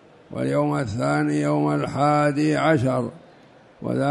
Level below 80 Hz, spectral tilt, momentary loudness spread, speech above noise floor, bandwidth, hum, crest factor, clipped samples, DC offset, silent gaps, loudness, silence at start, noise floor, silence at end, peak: -56 dBFS; -7 dB/octave; 9 LU; 29 dB; 11.5 kHz; none; 16 dB; under 0.1%; under 0.1%; none; -22 LUFS; 0.3 s; -50 dBFS; 0 s; -6 dBFS